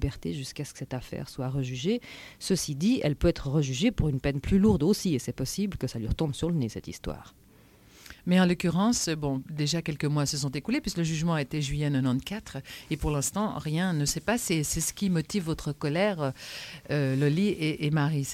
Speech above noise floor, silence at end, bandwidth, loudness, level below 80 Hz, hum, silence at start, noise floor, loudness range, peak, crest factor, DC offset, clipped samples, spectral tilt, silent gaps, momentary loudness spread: 28 dB; 0 s; 16 kHz; -28 LUFS; -44 dBFS; none; 0 s; -56 dBFS; 3 LU; -12 dBFS; 16 dB; under 0.1%; under 0.1%; -5.5 dB/octave; none; 12 LU